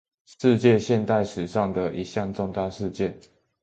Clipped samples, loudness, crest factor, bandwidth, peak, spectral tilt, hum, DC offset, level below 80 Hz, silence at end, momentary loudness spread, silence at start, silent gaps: under 0.1%; -24 LUFS; 20 dB; 8.8 kHz; -6 dBFS; -7 dB/octave; none; under 0.1%; -52 dBFS; 0.45 s; 10 LU; 0.4 s; none